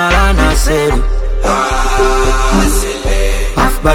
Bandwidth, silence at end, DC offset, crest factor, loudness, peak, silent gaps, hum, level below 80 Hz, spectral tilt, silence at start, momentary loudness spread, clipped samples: 16.5 kHz; 0 s; under 0.1%; 10 dB; -13 LUFS; 0 dBFS; none; none; -12 dBFS; -4.5 dB/octave; 0 s; 5 LU; under 0.1%